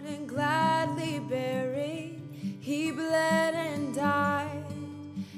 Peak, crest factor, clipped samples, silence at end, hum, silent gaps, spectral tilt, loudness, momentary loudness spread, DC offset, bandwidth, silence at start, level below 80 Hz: -14 dBFS; 16 dB; under 0.1%; 0 s; none; none; -5.5 dB/octave; -30 LUFS; 13 LU; under 0.1%; 15 kHz; 0 s; -74 dBFS